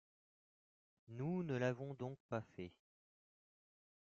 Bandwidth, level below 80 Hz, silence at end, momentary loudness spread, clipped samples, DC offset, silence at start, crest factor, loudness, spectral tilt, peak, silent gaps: 7.4 kHz; -82 dBFS; 1.45 s; 14 LU; under 0.1%; under 0.1%; 1.1 s; 20 dB; -45 LUFS; -7 dB/octave; -28 dBFS; 2.20-2.29 s